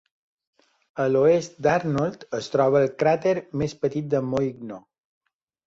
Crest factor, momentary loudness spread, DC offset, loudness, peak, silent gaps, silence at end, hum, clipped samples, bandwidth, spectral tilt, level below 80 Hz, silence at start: 18 dB; 12 LU; under 0.1%; -23 LUFS; -8 dBFS; none; 0.9 s; none; under 0.1%; 7.8 kHz; -6.5 dB/octave; -58 dBFS; 0.95 s